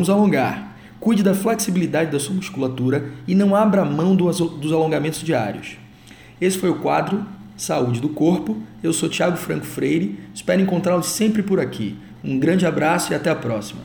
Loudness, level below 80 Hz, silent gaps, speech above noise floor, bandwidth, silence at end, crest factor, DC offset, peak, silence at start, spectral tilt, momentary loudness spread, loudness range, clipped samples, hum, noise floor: -20 LUFS; -54 dBFS; none; 24 dB; over 20 kHz; 0 s; 16 dB; under 0.1%; -4 dBFS; 0 s; -5.5 dB/octave; 10 LU; 3 LU; under 0.1%; none; -44 dBFS